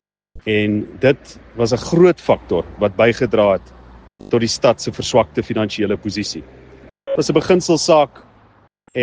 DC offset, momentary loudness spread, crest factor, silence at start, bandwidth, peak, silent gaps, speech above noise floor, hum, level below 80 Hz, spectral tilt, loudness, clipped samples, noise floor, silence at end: under 0.1%; 10 LU; 18 dB; 0.35 s; 9.8 kHz; 0 dBFS; none; 36 dB; none; -46 dBFS; -5 dB/octave; -17 LUFS; under 0.1%; -52 dBFS; 0 s